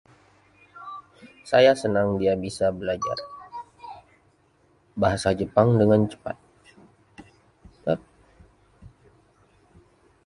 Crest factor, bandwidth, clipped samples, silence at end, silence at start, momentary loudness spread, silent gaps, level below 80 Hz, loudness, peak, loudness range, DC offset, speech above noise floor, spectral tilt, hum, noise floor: 22 dB; 11.5 kHz; under 0.1%; 1.4 s; 0.75 s; 23 LU; none; -52 dBFS; -23 LUFS; -4 dBFS; 13 LU; under 0.1%; 41 dB; -6.5 dB/octave; none; -62 dBFS